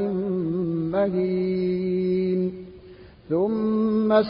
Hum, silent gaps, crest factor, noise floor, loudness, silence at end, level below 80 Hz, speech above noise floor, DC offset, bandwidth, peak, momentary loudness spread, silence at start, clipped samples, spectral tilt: none; none; 16 dB; -46 dBFS; -24 LUFS; 0 s; -54 dBFS; 24 dB; under 0.1%; 5.4 kHz; -8 dBFS; 5 LU; 0 s; under 0.1%; -12.5 dB/octave